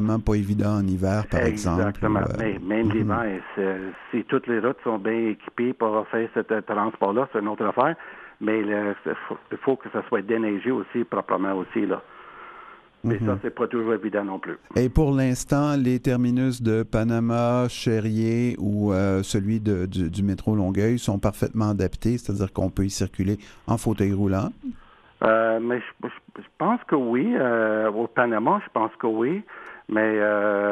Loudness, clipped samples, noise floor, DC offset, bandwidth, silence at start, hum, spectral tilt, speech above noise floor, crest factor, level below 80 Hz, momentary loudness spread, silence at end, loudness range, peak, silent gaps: -24 LUFS; under 0.1%; -47 dBFS; under 0.1%; 14 kHz; 0 s; none; -7 dB/octave; 23 dB; 20 dB; -44 dBFS; 8 LU; 0 s; 3 LU; -4 dBFS; none